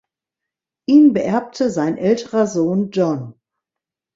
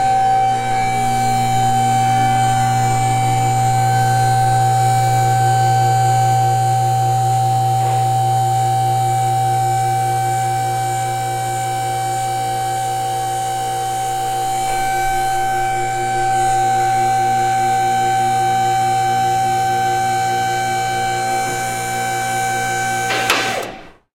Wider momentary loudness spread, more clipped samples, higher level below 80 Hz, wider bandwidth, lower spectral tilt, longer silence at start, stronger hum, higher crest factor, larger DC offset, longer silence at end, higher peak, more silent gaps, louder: first, 11 LU vs 5 LU; neither; second, -62 dBFS vs -40 dBFS; second, 7.8 kHz vs 16.5 kHz; first, -7 dB/octave vs -4 dB/octave; first, 0.9 s vs 0 s; neither; about the same, 16 dB vs 16 dB; neither; first, 0.85 s vs 0.25 s; about the same, -2 dBFS vs -2 dBFS; neither; about the same, -17 LUFS vs -17 LUFS